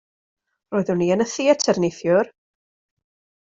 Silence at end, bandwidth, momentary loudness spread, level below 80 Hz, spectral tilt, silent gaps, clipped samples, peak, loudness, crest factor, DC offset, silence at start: 1.15 s; 8 kHz; 7 LU; -64 dBFS; -5 dB/octave; none; under 0.1%; -4 dBFS; -21 LUFS; 20 dB; under 0.1%; 0.7 s